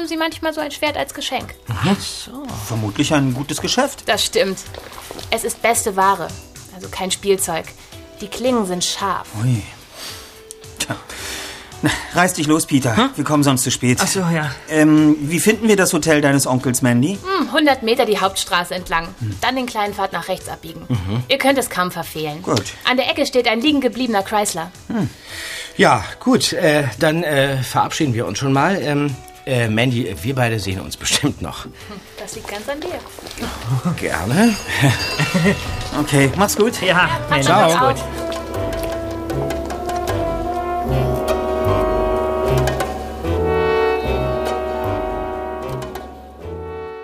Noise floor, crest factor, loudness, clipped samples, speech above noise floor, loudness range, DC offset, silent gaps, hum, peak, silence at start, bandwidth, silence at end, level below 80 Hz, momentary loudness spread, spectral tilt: -38 dBFS; 18 dB; -18 LUFS; under 0.1%; 20 dB; 7 LU; under 0.1%; none; none; 0 dBFS; 0 s; 15.5 kHz; 0 s; -36 dBFS; 14 LU; -4.5 dB/octave